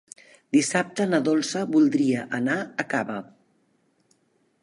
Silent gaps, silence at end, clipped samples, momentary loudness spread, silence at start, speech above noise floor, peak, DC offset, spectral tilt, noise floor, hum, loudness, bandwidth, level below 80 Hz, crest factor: none; 1.4 s; under 0.1%; 7 LU; 0.55 s; 44 dB; -8 dBFS; under 0.1%; -4.5 dB/octave; -67 dBFS; none; -24 LUFS; 11.5 kHz; -72 dBFS; 18 dB